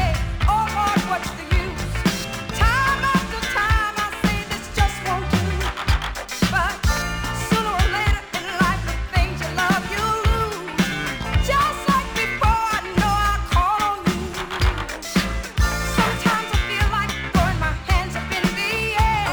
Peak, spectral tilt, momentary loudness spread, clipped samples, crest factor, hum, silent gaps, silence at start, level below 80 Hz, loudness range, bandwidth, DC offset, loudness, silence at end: -4 dBFS; -4.5 dB/octave; 5 LU; under 0.1%; 16 dB; none; none; 0 s; -28 dBFS; 2 LU; over 20 kHz; under 0.1%; -21 LUFS; 0 s